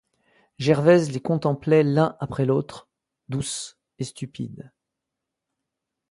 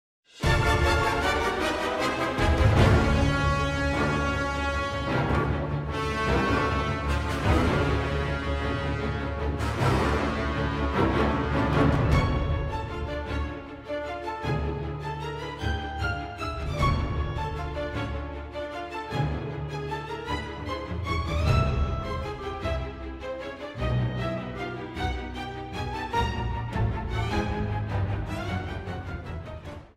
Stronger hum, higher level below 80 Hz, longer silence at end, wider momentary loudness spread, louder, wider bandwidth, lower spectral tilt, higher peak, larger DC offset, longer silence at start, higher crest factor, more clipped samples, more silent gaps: neither; second, -60 dBFS vs -34 dBFS; first, 1.5 s vs 0.1 s; first, 17 LU vs 11 LU; first, -23 LUFS vs -28 LUFS; second, 11.5 kHz vs 14 kHz; about the same, -6.5 dB/octave vs -6.5 dB/octave; first, -4 dBFS vs -8 dBFS; neither; first, 0.6 s vs 0.35 s; about the same, 20 dB vs 18 dB; neither; neither